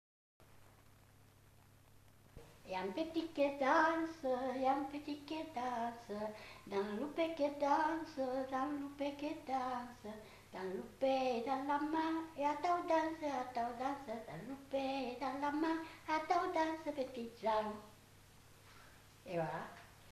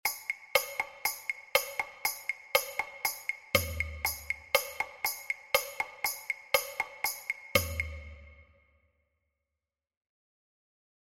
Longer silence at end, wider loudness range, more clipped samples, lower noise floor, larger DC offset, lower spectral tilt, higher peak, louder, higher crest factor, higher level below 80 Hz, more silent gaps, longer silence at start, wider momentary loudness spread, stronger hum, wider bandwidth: second, 0 s vs 2.65 s; about the same, 5 LU vs 5 LU; neither; second, -65 dBFS vs -88 dBFS; neither; first, -5 dB/octave vs -1.5 dB/octave; second, -20 dBFS vs -8 dBFS; second, -39 LUFS vs -32 LUFS; second, 20 dB vs 28 dB; second, -70 dBFS vs -52 dBFS; neither; first, 0.4 s vs 0.05 s; first, 12 LU vs 7 LU; first, 50 Hz at -70 dBFS vs none; second, 14 kHz vs 16.5 kHz